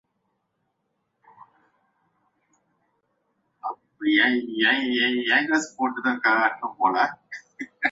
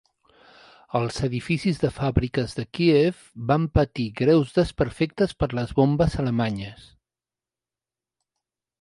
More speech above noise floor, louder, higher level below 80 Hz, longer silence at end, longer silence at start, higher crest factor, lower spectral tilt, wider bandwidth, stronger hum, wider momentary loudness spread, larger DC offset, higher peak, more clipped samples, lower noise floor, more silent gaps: second, 53 dB vs over 67 dB; about the same, -22 LUFS vs -24 LUFS; second, -74 dBFS vs -40 dBFS; second, 0 s vs 2.1 s; first, 3.65 s vs 0.95 s; about the same, 20 dB vs 20 dB; second, -2.5 dB/octave vs -7.5 dB/octave; second, 7.8 kHz vs 11.5 kHz; neither; first, 16 LU vs 8 LU; neither; about the same, -6 dBFS vs -4 dBFS; neither; second, -76 dBFS vs under -90 dBFS; neither